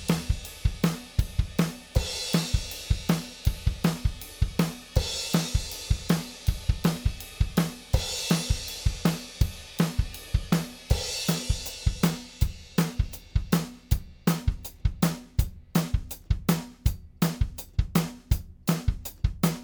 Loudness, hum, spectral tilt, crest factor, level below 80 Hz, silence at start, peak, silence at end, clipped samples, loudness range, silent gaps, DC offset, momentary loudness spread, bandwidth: -29 LUFS; none; -5 dB/octave; 20 dB; -32 dBFS; 0 s; -8 dBFS; 0 s; under 0.1%; 1 LU; none; under 0.1%; 5 LU; over 20 kHz